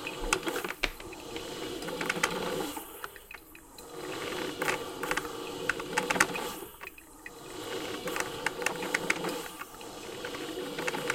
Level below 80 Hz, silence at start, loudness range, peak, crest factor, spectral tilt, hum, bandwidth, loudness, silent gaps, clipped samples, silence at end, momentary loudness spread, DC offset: -54 dBFS; 0 s; 3 LU; -4 dBFS; 32 dB; -2.5 dB/octave; none; 17 kHz; -34 LUFS; none; under 0.1%; 0 s; 14 LU; under 0.1%